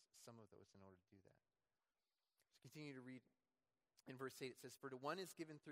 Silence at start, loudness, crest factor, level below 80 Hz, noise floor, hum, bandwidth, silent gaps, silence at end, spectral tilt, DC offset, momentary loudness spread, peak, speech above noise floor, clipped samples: 0 s; -55 LUFS; 26 dB; under -90 dBFS; under -90 dBFS; none; 16 kHz; none; 0 s; -4.5 dB/octave; under 0.1%; 18 LU; -34 dBFS; over 34 dB; under 0.1%